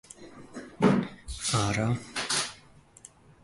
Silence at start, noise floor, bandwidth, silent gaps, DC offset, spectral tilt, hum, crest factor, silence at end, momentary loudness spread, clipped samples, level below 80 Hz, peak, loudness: 0.2 s; -55 dBFS; 11.5 kHz; none; under 0.1%; -4.5 dB/octave; none; 20 dB; 0.85 s; 20 LU; under 0.1%; -52 dBFS; -10 dBFS; -28 LUFS